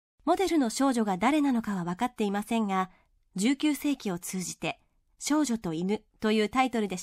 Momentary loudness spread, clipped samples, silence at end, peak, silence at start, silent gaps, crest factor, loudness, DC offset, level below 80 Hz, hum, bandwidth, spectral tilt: 8 LU; under 0.1%; 0 s; -12 dBFS; 0.25 s; none; 16 dB; -29 LUFS; under 0.1%; -62 dBFS; none; 16 kHz; -4.5 dB/octave